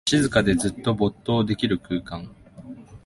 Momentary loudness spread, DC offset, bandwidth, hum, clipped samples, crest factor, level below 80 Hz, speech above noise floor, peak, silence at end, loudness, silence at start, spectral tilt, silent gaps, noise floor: 22 LU; under 0.1%; 11.5 kHz; none; under 0.1%; 18 dB; -44 dBFS; 19 dB; -6 dBFS; 0.1 s; -23 LUFS; 0.05 s; -5 dB/octave; none; -42 dBFS